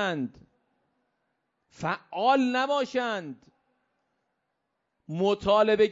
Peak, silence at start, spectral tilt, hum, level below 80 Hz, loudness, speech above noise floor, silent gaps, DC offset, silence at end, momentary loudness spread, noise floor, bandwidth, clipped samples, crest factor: -10 dBFS; 0 s; -5.5 dB/octave; none; -62 dBFS; -26 LUFS; 54 dB; none; under 0.1%; 0 s; 13 LU; -80 dBFS; 7.8 kHz; under 0.1%; 18 dB